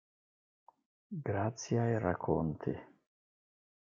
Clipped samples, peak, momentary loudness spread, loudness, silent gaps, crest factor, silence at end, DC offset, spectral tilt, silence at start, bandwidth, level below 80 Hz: under 0.1%; -16 dBFS; 10 LU; -36 LUFS; none; 22 dB; 1.05 s; under 0.1%; -7 dB/octave; 1.1 s; 7.4 kHz; -64 dBFS